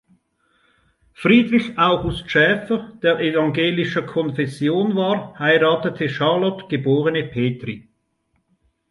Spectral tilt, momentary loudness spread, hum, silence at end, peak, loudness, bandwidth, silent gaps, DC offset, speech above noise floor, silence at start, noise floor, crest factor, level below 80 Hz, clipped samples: -7 dB/octave; 8 LU; none; 1.1 s; -2 dBFS; -19 LUFS; 11.5 kHz; none; under 0.1%; 50 dB; 1.2 s; -69 dBFS; 18 dB; -48 dBFS; under 0.1%